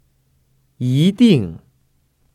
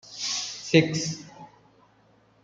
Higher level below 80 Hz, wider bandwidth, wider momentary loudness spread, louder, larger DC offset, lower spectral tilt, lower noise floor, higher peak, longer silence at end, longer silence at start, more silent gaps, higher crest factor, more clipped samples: first, -54 dBFS vs -66 dBFS; first, 13.5 kHz vs 9.4 kHz; second, 13 LU vs 16 LU; first, -15 LUFS vs -25 LUFS; neither; first, -7.5 dB/octave vs -4 dB/octave; about the same, -61 dBFS vs -61 dBFS; first, 0 dBFS vs -4 dBFS; second, 0.8 s vs 1 s; first, 0.8 s vs 0.05 s; neither; second, 18 dB vs 24 dB; neither